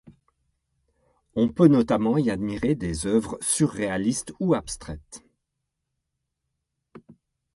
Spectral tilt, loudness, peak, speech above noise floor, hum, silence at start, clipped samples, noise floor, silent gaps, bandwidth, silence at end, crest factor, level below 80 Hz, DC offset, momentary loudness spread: -5.5 dB/octave; -24 LUFS; -4 dBFS; 58 dB; none; 0.05 s; under 0.1%; -81 dBFS; none; 11.5 kHz; 0.45 s; 22 dB; -50 dBFS; under 0.1%; 15 LU